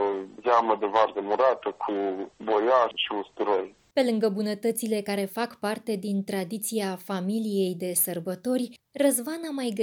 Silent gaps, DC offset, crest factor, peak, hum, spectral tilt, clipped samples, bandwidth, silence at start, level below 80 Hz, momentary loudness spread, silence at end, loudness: none; under 0.1%; 18 dB; -8 dBFS; none; -4 dB/octave; under 0.1%; over 20 kHz; 0 s; -76 dBFS; 8 LU; 0 s; -27 LUFS